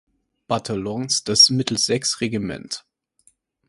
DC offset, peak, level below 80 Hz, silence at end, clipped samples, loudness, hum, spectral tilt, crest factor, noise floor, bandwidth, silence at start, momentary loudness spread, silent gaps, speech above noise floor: under 0.1%; 0 dBFS; -56 dBFS; 0.9 s; under 0.1%; -19 LUFS; none; -3 dB/octave; 22 dB; -61 dBFS; 11.5 kHz; 0.5 s; 17 LU; none; 40 dB